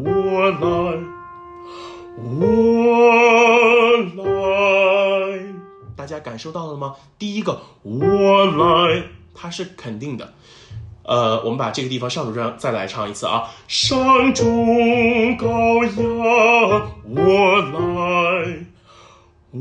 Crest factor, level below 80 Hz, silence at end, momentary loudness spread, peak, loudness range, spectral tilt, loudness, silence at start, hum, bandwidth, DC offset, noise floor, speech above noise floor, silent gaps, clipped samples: 14 dB; -48 dBFS; 0 s; 21 LU; -4 dBFS; 9 LU; -5 dB/octave; -16 LUFS; 0 s; none; 9.8 kHz; under 0.1%; -49 dBFS; 31 dB; none; under 0.1%